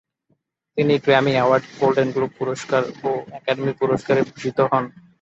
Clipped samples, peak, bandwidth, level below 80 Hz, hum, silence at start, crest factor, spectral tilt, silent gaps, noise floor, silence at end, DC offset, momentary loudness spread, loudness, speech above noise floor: under 0.1%; -2 dBFS; 8 kHz; -62 dBFS; none; 0.75 s; 20 dB; -6 dB/octave; none; -68 dBFS; 0.3 s; under 0.1%; 9 LU; -20 LUFS; 49 dB